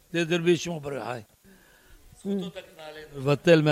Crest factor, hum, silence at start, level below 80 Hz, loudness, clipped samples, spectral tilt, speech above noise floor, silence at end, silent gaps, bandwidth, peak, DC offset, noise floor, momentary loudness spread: 22 dB; none; 0.15 s; -60 dBFS; -26 LUFS; under 0.1%; -6 dB/octave; 31 dB; 0 s; none; 15.5 kHz; -6 dBFS; under 0.1%; -56 dBFS; 20 LU